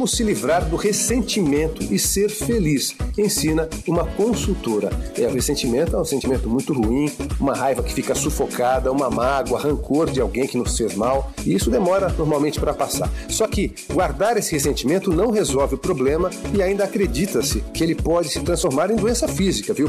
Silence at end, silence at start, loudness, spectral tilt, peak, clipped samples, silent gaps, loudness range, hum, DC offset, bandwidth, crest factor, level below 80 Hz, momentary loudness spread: 0 s; 0 s; -20 LUFS; -4.5 dB/octave; -10 dBFS; under 0.1%; none; 1 LU; none; under 0.1%; 16 kHz; 10 dB; -32 dBFS; 4 LU